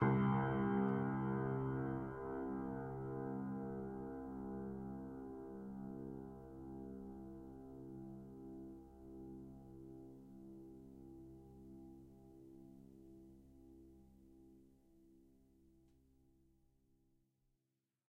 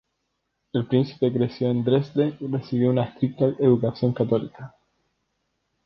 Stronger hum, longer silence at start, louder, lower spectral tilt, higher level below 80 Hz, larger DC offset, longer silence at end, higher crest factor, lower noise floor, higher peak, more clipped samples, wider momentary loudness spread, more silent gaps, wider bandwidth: neither; second, 0 s vs 0.75 s; second, -44 LUFS vs -23 LUFS; about the same, -10 dB/octave vs -10.5 dB/octave; second, -66 dBFS vs -60 dBFS; neither; first, 2.85 s vs 1.2 s; about the same, 22 dB vs 18 dB; first, -89 dBFS vs -76 dBFS; second, -24 dBFS vs -6 dBFS; neither; first, 24 LU vs 9 LU; neither; second, 3.3 kHz vs 6 kHz